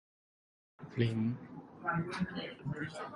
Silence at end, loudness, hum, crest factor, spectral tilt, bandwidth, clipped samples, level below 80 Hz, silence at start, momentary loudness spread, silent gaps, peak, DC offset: 0 s; -38 LUFS; none; 20 dB; -7 dB/octave; 11.5 kHz; under 0.1%; -64 dBFS; 0.8 s; 12 LU; none; -18 dBFS; under 0.1%